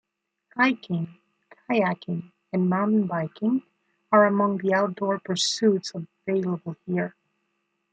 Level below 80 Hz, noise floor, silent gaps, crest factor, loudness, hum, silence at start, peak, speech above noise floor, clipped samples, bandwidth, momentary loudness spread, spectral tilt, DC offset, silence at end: -74 dBFS; -75 dBFS; none; 20 dB; -25 LUFS; none; 0.55 s; -6 dBFS; 52 dB; under 0.1%; 9.2 kHz; 12 LU; -5.5 dB/octave; under 0.1%; 0.8 s